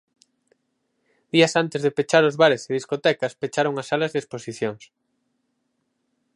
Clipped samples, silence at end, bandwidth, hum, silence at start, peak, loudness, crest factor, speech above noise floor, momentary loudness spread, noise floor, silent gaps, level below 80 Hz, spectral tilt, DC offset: under 0.1%; 1.6 s; 11.5 kHz; none; 1.35 s; -2 dBFS; -22 LUFS; 22 dB; 52 dB; 11 LU; -74 dBFS; none; -72 dBFS; -4.5 dB/octave; under 0.1%